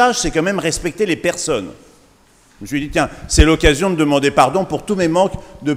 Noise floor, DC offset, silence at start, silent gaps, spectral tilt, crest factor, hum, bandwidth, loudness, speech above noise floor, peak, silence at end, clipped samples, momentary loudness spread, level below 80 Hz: -51 dBFS; under 0.1%; 0 s; none; -4.5 dB/octave; 16 dB; none; 16 kHz; -16 LUFS; 35 dB; 0 dBFS; 0 s; under 0.1%; 10 LU; -26 dBFS